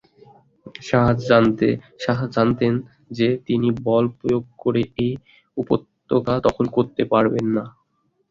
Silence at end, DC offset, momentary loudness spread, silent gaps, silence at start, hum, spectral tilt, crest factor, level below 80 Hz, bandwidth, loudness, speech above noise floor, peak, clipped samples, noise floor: 0.6 s; under 0.1%; 9 LU; none; 0.65 s; none; -8 dB/octave; 18 dB; -48 dBFS; 7.4 kHz; -21 LUFS; 48 dB; -2 dBFS; under 0.1%; -68 dBFS